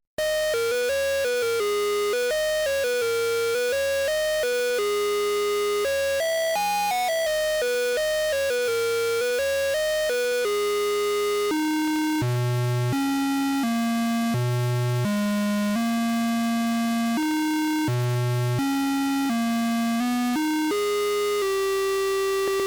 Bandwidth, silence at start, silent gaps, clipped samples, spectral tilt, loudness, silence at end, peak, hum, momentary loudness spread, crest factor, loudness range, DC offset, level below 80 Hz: over 20 kHz; 0.2 s; none; under 0.1%; -5 dB/octave; -24 LUFS; 0 s; -20 dBFS; none; 1 LU; 4 dB; 1 LU; under 0.1%; -56 dBFS